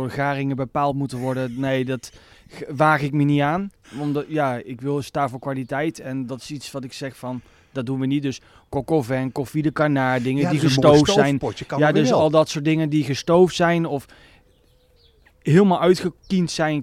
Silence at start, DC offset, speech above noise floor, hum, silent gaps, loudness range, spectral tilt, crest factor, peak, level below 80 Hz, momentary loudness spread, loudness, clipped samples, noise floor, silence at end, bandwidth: 0 s; under 0.1%; 37 dB; none; none; 9 LU; -6 dB/octave; 18 dB; -4 dBFS; -52 dBFS; 15 LU; -21 LUFS; under 0.1%; -57 dBFS; 0 s; 15 kHz